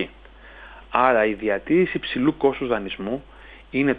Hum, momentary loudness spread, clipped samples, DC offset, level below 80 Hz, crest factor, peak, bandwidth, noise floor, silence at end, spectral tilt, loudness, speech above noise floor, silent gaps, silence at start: none; 14 LU; under 0.1%; under 0.1%; -48 dBFS; 22 dB; -2 dBFS; 4.9 kHz; -45 dBFS; 0 s; -8.5 dB/octave; -22 LUFS; 24 dB; none; 0 s